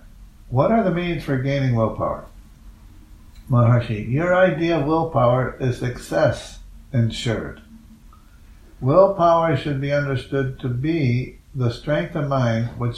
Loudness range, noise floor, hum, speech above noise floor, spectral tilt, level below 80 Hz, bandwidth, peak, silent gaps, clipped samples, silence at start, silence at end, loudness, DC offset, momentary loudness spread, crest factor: 3 LU; -46 dBFS; none; 27 dB; -7.5 dB/octave; -42 dBFS; 11.5 kHz; -2 dBFS; none; under 0.1%; 0.05 s; 0 s; -21 LUFS; under 0.1%; 9 LU; 20 dB